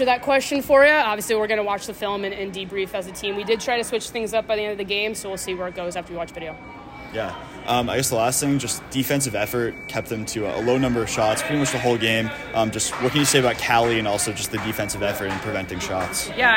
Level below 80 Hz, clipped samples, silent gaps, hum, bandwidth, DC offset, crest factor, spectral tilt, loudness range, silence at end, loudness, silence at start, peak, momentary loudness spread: -48 dBFS; under 0.1%; none; none; 16.5 kHz; under 0.1%; 18 dB; -3.5 dB/octave; 6 LU; 0 s; -22 LUFS; 0 s; -4 dBFS; 11 LU